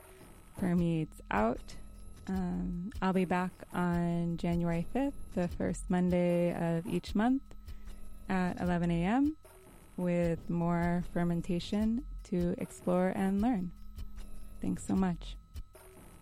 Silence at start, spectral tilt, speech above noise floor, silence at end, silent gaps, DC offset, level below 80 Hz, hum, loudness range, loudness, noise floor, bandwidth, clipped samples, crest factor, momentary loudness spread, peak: 0 s; -7.5 dB/octave; 23 dB; 0.05 s; none; under 0.1%; -48 dBFS; none; 2 LU; -33 LUFS; -55 dBFS; 12.5 kHz; under 0.1%; 16 dB; 20 LU; -16 dBFS